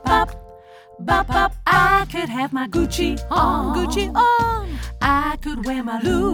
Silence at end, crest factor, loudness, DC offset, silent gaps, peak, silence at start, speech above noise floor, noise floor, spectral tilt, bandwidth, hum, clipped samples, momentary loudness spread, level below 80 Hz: 0 s; 16 dB; -19 LUFS; under 0.1%; none; -4 dBFS; 0 s; 24 dB; -43 dBFS; -5 dB/octave; 20 kHz; none; under 0.1%; 9 LU; -30 dBFS